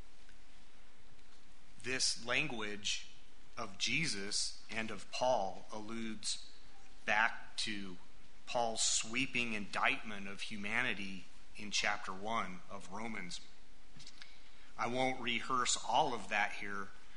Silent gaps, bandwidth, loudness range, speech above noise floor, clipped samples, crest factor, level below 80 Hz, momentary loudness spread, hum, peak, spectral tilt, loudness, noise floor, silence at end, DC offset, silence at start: none; 10.5 kHz; 5 LU; 24 dB; under 0.1%; 24 dB; -64 dBFS; 18 LU; none; -16 dBFS; -2 dB/octave; -37 LUFS; -62 dBFS; 0 s; 1%; 0 s